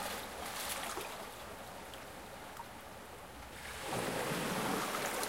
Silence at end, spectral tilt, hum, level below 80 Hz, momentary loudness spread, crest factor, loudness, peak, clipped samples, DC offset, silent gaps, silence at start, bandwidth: 0 s; -3 dB/octave; none; -62 dBFS; 13 LU; 22 dB; -41 LUFS; -20 dBFS; under 0.1%; under 0.1%; none; 0 s; 16.5 kHz